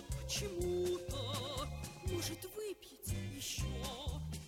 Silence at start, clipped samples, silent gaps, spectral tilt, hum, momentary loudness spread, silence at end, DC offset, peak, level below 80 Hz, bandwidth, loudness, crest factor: 0 s; under 0.1%; none; -4.5 dB/octave; none; 7 LU; 0 s; under 0.1%; -26 dBFS; -48 dBFS; 17.5 kHz; -41 LUFS; 14 dB